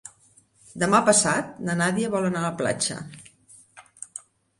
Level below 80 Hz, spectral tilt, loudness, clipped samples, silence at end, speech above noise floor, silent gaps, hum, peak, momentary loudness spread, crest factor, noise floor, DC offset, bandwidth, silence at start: -62 dBFS; -3.5 dB/octave; -23 LUFS; under 0.1%; 0.4 s; 36 dB; none; none; -4 dBFS; 23 LU; 22 dB; -59 dBFS; under 0.1%; 11.5 kHz; 0.05 s